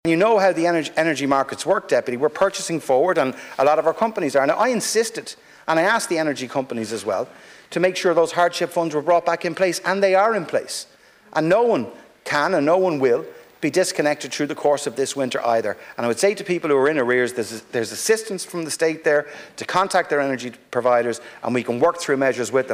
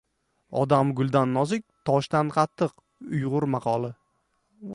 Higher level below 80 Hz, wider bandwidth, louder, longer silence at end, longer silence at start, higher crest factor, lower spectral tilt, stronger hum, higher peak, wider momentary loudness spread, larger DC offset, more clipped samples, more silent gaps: about the same, -66 dBFS vs -62 dBFS; first, 16 kHz vs 11.5 kHz; first, -20 LUFS vs -25 LUFS; about the same, 0 s vs 0 s; second, 0.05 s vs 0.5 s; second, 14 dB vs 20 dB; second, -4 dB/octave vs -7.5 dB/octave; neither; about the same, -8 dBFS vs -6 dBFS; about the same, 9 LU vs 10 LU; neither; neither; neither